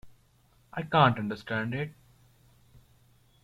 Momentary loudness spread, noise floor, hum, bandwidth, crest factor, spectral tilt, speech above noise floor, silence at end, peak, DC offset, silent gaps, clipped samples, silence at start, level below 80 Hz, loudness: 16 LU; -64 dBFS; none; 13.5 kHz; 24 dB; -7.5 dB/octave; 37 dB; 1.5 s; -8 dBFS; under 0.1%; none; under 0.1%; 0.05 s; -62 dBFS; -28 LUFS